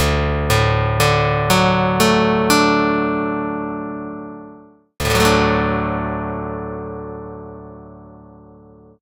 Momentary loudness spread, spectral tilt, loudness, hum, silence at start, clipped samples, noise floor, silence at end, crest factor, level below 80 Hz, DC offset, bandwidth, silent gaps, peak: 18 LU; -5 dB/octave; -17 LUFS; none; 0 s; under 0.1%; -45 dBFS; 0.7 s; 18 dB; -34 dBFS; under 0.1%; 16 kHz; none; 0 dBFS